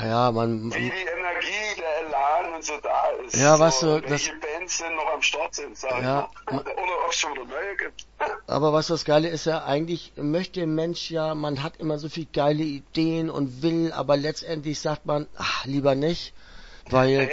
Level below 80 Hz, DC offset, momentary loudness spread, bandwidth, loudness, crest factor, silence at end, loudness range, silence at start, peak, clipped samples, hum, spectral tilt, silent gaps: -52 dBFS; under 0.1%; 8 LU; 8 kHz; -25 LUFS; 22 dB; 0 s; 4 LU; 0 s; -4 dBFS; under 0.1%; none; -4.5 dB/octave; none